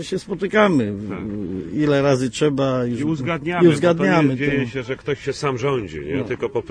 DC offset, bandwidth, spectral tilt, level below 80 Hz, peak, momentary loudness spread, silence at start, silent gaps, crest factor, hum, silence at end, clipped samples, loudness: under 0.1%; 11 kHz; -6.5 dB/octave; -48 dBFS; -2 dBFS; 10 LU; 0 s; none; 18 dB; none; 0 s; under 0.1%; -20 LUFS